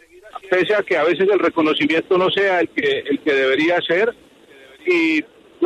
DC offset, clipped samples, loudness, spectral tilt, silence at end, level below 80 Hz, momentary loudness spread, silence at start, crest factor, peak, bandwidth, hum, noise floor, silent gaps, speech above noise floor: under 0.1%; under 0.1%; -18 LUFS; -5 dB/octave; 0 s; -64 dBFS; 5 LU; 0.25 s; 12 dB; -6 dBFS; 10.5 kHz; none; -46 dBFS; none; 29 dB